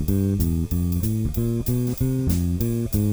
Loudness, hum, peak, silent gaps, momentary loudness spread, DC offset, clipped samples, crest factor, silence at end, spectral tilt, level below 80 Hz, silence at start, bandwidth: -23 LUFS; none; -8 dBFS; none; 2 LU; under 0.1%; under 0.1%; 14 dB; 0 s; -7.5 dB/octave; -32 dBFS; 0 s; over 20 kHz